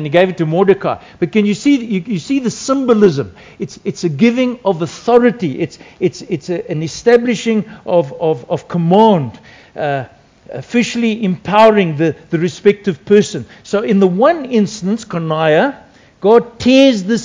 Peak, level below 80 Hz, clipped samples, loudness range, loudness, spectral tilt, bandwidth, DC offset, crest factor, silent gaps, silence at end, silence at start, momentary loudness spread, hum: 0 dBFS; -50 dBFS; 0.3%; 3 LU; -14 LUFS; -6 dB/octave; 8 kHz; under 0.1%; 14 dB; none; 0 s; 0 s; 12 LU; none